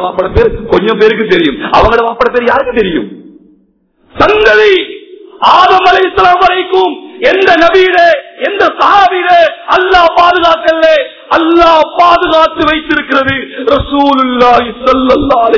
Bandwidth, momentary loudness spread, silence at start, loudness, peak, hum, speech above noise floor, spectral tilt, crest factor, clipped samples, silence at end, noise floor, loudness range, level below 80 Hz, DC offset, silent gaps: 6 kHz; 6 LU; 0 s; -7 LUFS; 0 dBFS; none; 44 dB; -5.5 dB/octave; 8 dB; 6%; 0 s; -51 dBFS; 3 LU; -30 dBFS; 0.2%; none